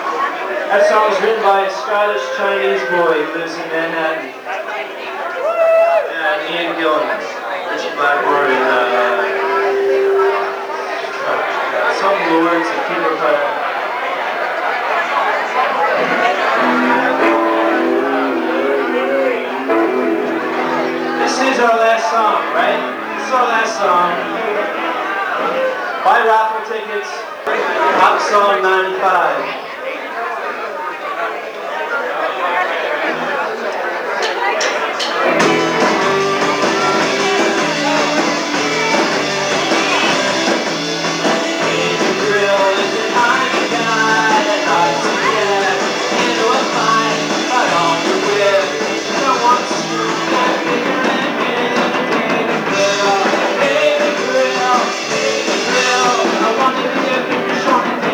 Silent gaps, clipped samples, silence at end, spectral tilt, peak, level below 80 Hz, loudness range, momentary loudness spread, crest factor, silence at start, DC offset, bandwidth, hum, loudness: none; under 0.1%; 0 s; -3 dB/octave; 0 dBFS; -68 dBFS; 3 LU; 7 LU; 16 dB; 0 s; under 0.1%; over 20 kHz; none; -15 LUFS